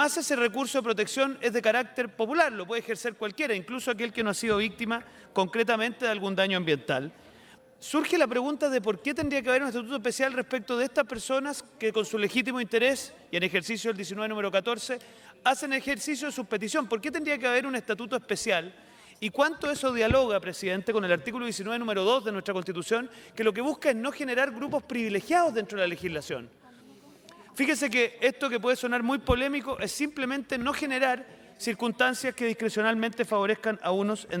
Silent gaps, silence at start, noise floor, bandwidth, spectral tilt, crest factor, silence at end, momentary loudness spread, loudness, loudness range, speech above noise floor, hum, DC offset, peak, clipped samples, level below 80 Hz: none; 0 s; -55 dBFS; 18 kHz; -3.5 dB/octave; 20 dB; 0 s; 7 LU; -28 LUFS; 2 LU; 26 dB; none; under 0.1%; -10 dBFS; under 0.1%; -54 dBFS